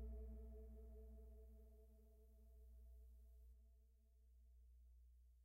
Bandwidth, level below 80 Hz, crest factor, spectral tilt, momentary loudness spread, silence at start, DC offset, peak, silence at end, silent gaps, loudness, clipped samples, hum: 15.5 kHz; -62 dBFS; 16 dB; -9 dB/octave; 11 LU; 0 s; under 0.1%; -46 dBFS; 0 s; none; -63 LUFS; under 0.1%; none